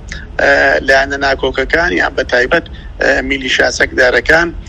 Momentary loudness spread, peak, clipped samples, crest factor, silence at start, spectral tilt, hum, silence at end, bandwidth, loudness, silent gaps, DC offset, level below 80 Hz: 6 LU; 0 dBFS; 0.2%; 12 dB; 0 s; -3.5 dB/octave; none; 0.05 s; 12.5 kHz; -11 LUFS; none; under 0.1%; -30 dBFS